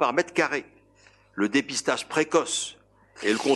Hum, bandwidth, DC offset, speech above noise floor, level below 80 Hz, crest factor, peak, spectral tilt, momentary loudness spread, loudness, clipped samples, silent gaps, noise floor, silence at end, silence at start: 50 Hz at -55 dBFS; 12 kHz; under 0.1%; 33 dB; -68 dBFS; 20 dB; -6 dBFS; -3 dB/octave; 8 LU; -26 LUFS; under 0.1%; none; -58 dBFS; 0 s; 0 s